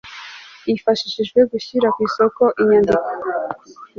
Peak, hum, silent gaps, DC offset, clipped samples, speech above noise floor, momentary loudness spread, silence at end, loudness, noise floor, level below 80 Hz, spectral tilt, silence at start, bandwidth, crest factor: -2 dBFS; none; none; under 0.1%; under 0.1%; 21 dB; 16 LU; 0.15 s; -18 LUFS; -38 dBFS; -54 dBFS; -5.5 dB/octave; 0.05 s; 7.2 kHz; 16 dB